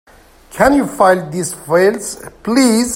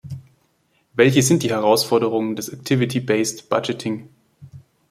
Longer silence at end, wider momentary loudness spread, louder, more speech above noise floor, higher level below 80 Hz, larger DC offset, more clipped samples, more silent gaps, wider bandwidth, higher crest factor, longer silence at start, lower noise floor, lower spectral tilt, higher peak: second, 0 s vs 0.3 s; about the same, 13 LU vs 13 LU; first, -14 LUFS vs -19 LUFS; second, 27 dB vs 45 dB; first, -42 dBFS vs -60 dBFS; neither; neither; neither; about the same, 16.5 kHz vs 16.5 kHz; about the same, 14 dB vs 18 dB; first, 0.5 s vs 0.05 s; second, -41 dBFS vs -64 dBFS; about the same, -4.5 dB/octave vs -5 dB/octave; about the same, 0 dBFS vs -2 dBFS